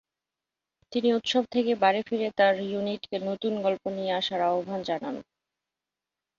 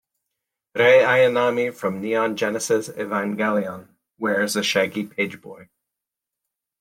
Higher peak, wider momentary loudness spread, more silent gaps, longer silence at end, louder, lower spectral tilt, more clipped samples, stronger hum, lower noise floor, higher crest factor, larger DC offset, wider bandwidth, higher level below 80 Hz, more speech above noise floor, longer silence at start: second, -8 dBFS vs -4 dBFS; second, 9 LU vs 12 LU; neither; about the same, 1.15 s vs 1.15 s; second, -27 LUFS vs -21 LUFS; about the same, -5 dB/octave vs -4 dB/octave; neither; neither; first, -89 dBFS vs -85 dBFS; about the same, 20 dB vs 18 dB; neither; second, 7.6 kHz vs 16.5 kHz; about the same, -72 dBFS vs -70 dBFS; about the same, 62 dB vs 65 dB; first, 0.9 s vs 0.75 s